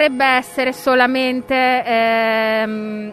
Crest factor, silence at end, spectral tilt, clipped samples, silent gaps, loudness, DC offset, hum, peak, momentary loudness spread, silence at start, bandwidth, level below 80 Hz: 16 dB; 0 s; -4 dB/octave; under 0.1%; none; -16 LUFS; under 0.1%; none; 0 dBFS; 6 LU; 0 s; 14 kHz; -56 dBFS